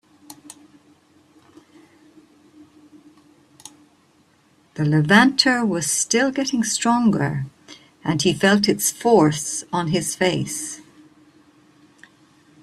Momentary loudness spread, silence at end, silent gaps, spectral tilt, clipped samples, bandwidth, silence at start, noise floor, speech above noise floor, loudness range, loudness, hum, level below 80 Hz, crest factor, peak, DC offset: 15 LU; 1.85 s; none; -4 dB/octave; under 0.1%; 14 kHz; 0.3 s; -58 dBFS; 39 dB; 6 LU; -19 LUFS; none; -60 dBFS; 22 dB; -2 dBFS; under 0.1%